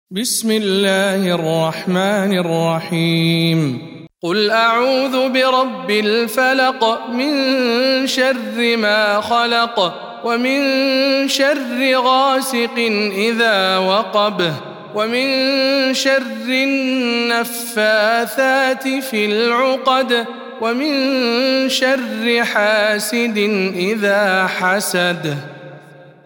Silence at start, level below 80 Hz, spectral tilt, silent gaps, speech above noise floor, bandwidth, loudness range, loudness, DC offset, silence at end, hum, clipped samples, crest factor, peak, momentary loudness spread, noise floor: 0.1 s; -68 dBFS; -4 dB/octave; none; 25 dB; 18 kHz; 1 LU; -16 LUFS; under 0.1%; 0.15 s; none; under 0.1%; 14 dB; -2 dBFS; 5 LU; -41 dBFS